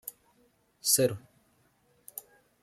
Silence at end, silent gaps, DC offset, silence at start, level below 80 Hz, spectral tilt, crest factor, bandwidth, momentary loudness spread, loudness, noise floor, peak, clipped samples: 0.45 s; none; under 0.1%; 0.05 s; -74 dBFS; -2.5 dB/octave; 24 dB; 16 kHz; 20 LU; -27 LUFS; -68 dBFS; -10 dBFS; under 0.1%